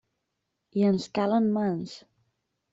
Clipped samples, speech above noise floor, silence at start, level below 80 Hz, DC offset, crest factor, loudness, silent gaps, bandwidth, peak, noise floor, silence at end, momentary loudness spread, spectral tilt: under 0.1%; 56 dB; 0.75 s; -70 dBFS; under 0.1%; 14 dB; -27 LUFS; none; 7.8 kHz; -14 dBFS; -81 dBFS; 0.75 s; 14 LU; -7.5 dB/octave